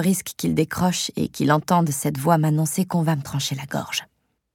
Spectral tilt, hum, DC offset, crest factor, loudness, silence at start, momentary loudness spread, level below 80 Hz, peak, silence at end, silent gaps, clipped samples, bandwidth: -5 dB/octave; none; under 0.1%; 18 dB; -22 LUFS; 0 s; 7 LU; -54 dBFS; -4 dBFS; 0.5 s; none; under 0.1%; 17.5 kHz